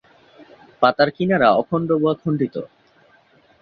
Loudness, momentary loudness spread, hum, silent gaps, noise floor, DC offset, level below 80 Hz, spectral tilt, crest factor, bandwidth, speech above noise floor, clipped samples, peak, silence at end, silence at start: -19 LUFS; 9 LU; none; none; -55 dBFS; under 0.1%; -58 dBFS; -9 dB/octave; 18 dB; 6 kHz; 37 dB; under 0.1%; -2 dBFS; 0.95 s; 0.4 s